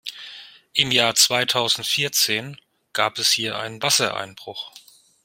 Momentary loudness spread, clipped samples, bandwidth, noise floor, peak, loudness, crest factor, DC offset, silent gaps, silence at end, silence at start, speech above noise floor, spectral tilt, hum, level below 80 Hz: 19 LU; under 0.1%; 16.5 kHz; -43 dBFS; 0 dBFS; -19 LUFS; 22 dB; under 0.1%; none; 0.45 s; 0.05 s; 21 dB; -1 dB/octave; none; -64 dBFS